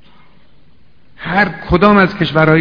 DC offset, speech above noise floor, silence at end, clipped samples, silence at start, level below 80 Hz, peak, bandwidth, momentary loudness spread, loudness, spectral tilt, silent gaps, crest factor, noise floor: 1%; 40 dB; 0 s; 0.2%; 1.2 s; -34 dBFS; 0 dBFS; 5.4 kHz; 7 LU; -12 LUFS; -8.5 dB/octave; none; 14 dB; -51 dBFS